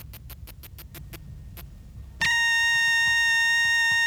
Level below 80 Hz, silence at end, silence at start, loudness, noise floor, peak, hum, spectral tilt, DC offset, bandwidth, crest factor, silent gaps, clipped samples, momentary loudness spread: -46 dBFS; 0 s; 0 s; -20 LUFS; -43 dBFS; -16 dBFS; none; 0.5 dB/octave; under 0.1%; over 20 kHz; 10 dB; none; under 0.1%; 23 LU